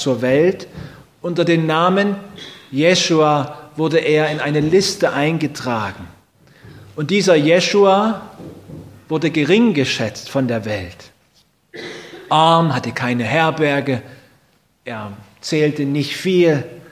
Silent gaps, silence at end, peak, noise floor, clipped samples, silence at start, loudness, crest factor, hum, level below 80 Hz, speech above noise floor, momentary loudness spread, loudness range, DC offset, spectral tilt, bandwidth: none; 0.1 s; 0 dBFS; -58 dBFS; under 0.1%; 0 s; -16 LUFS; 18 dB; none; -52 dBFS; 42 dB; 21 LU; 4 LU; under 0.1%; -5 dB/octave; 16 kHz